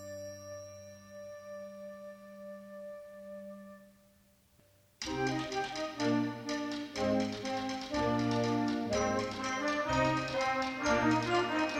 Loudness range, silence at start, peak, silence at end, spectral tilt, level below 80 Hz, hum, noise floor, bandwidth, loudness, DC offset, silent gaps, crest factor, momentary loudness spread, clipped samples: 16 LU; 0 s; -18 dBFS; 0 s; -5 dB/octave; -58 dBFS; none; -66 dBFS; 15.5 kHz; -33 LUFS; under 0.1%; none; 18 dB; 18 LU; under 0.1%